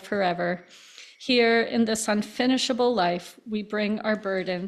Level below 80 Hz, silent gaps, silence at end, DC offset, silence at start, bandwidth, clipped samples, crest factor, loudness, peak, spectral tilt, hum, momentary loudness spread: -66 dBFS; none; 0 s; under 0.1%; 0 s; 14 kHz; under 0.1%; 16 dB; -25 LUFS; -10 dBFS; -4 dB/octave; none; 12 LU